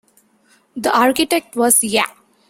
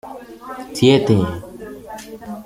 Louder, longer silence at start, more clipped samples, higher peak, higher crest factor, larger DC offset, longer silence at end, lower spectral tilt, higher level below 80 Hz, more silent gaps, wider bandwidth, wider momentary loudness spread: about the same, -16 LUFS vs -16 LUFS; first, 0.75 s vs 0.05 s; neither; about the same, 0 dBFS vs -2 dBFS; about the same, 18 dB vs 18 dB; neither; first, 0.4 s vs 0 s; second, -1.5 dB/octave vs -6.5 dB/octave; second, -58 dBFS vs -50 dBFS; neither; about the same, 16.5 kHz vs 16 kHz; second, 10 LU vs 21 LU